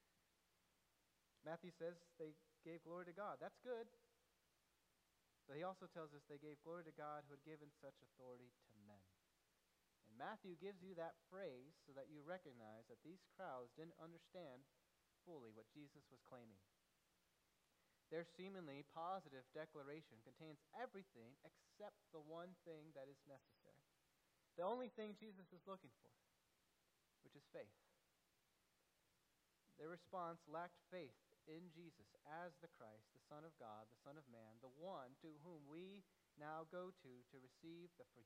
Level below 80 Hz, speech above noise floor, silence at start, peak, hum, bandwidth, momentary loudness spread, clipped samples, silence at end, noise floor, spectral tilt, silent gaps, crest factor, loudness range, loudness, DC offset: under -90 dBFS; 27 dB; 1.45 s; -36 dBFS; none; 11.5 kHz; 12 LU; under 0.1%; 0 s; -85 dBFS; -6.5 dB/octave; none; 24 dB; 7 LU; -58 LUFS; under 0.1%